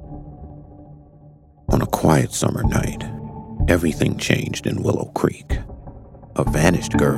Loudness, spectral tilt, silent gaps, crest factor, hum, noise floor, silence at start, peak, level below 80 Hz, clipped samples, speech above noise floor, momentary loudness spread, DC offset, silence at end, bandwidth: -21 LUFS; -5.5 dB/octave; none; 22 dB; none; -47 dBFS; 0 s; 0 dBFS; -32 dBFS; under 0.1%; 28 dB; 21 LU; under 0.1%; 0 s; 16 kHz